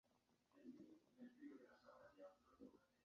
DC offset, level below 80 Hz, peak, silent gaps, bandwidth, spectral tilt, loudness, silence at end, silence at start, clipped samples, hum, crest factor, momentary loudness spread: under 0.1%; under -90 dBFS; -50 dBFS; none; 6.8 kHz; -5 dB/octave; -66 LUFS; 0 s; 0.05 s; under 0.1%; none; 16 dB; 5 LU